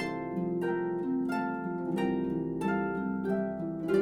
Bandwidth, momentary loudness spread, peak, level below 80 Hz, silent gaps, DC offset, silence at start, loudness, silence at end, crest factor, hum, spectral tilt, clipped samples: 12.5 kHz; 3 LU; -16 dBFS; -60 dBFS; none; under 0.1%; 0 s; -32 LUFS; 0 s; 16 dB; none; -8 dB/octave; under 0.1%